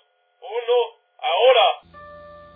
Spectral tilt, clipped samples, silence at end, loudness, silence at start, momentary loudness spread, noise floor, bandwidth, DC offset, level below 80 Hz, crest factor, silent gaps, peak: -4 dB/octave; under 0.1%; 0.35 s; -19 LUFS; 0.45 s; 15 LU; -43 dBFS; 3.8 kHz; under 0.1%; -64 dBFS; 16 dB; none; -6 dBFS